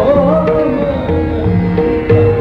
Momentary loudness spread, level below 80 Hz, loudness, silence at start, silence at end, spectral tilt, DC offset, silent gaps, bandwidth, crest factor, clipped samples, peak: 5 LU; -28 dBFS; -13 LUFS; 0 s; 0 s; -10 dB/octave; under 0.1%; none; 5.4 kHz; 12 dB; under 0.1%; 0 dBFS